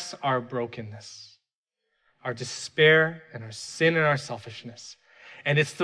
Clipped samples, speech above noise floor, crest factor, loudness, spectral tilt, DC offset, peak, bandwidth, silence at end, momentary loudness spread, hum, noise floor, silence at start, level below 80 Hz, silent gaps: under 0.1%; 57 dB; 20 dB; -24 LUFS; -4.5 dB/octave; under 0.1%; -8 dBFS; 11 kHz; 0 s; 23 LU; none; -83 dBFS; 0 s; -72 dBFS; 1.55-1.64 s